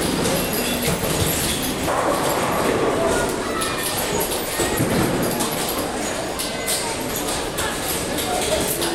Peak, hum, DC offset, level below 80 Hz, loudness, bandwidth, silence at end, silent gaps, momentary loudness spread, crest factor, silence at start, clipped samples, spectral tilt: -6 dBFS; none; under 0.1%; -40 dBFS; -21 LUFS; 18 kHz; 0 s; none; 4 LU; 16 dB; 0 s; under 0.1%; -3.5 dB/octave